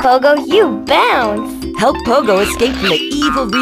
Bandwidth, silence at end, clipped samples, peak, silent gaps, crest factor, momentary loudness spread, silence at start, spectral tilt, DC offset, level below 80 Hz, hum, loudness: 16 kHz; 0 s; under 0.1%; 0 dBFS; none; 12 dB; 4 LU; 0 s; -4 dB/octave; under 0.1%; -36 dBFS; none; -13 LUFS